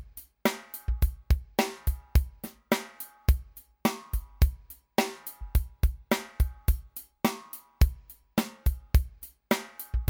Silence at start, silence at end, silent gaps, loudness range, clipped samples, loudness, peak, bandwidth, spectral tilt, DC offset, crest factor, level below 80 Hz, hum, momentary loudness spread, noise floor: 0 s; 0 s; none; 1 LU; under 0.1%; -30 LUFS; -8 dBFS; over 20 kHz; -5.5 dB/octave; under 0.1%; 20 dB; -30 dBFS; none; 13 LU; -45 dBFS